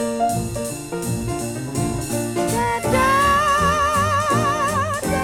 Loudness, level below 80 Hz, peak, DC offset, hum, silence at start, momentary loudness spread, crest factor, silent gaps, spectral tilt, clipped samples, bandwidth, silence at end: -20 LUFS; -38 dBFS; -6 dBFS; under 0.1%; none; 0 s; 10 LU; 14 dB; none; -4.5 dB/octave; under 0.1%; 18.5 kHz; 0 s